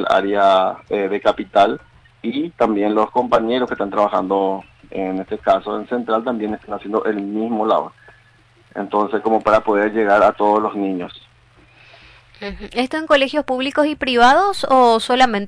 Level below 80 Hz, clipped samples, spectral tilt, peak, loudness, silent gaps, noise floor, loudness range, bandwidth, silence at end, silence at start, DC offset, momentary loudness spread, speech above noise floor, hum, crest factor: -50 dBFS; under 0.1%; -5 dB/octave; -4 dBFS; -17 LUFS; none; -52 dBFS; 4 LU; 11 kHz; 0 s; 0 s; under 0.1%; 12 LU; 35 dB; none; 14 dB